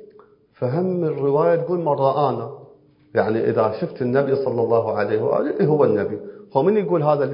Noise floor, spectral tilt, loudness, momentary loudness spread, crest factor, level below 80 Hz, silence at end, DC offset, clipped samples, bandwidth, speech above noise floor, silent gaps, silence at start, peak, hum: -51 dBFS; -12.5 dB/octave; -20 LUFS; 7 LU; 18 dB; -62 dBFS; 0 s; under 0.1%; under 0.1%; 5.4 kHz; 32 dB; none; 0 s; -2 dBFS; none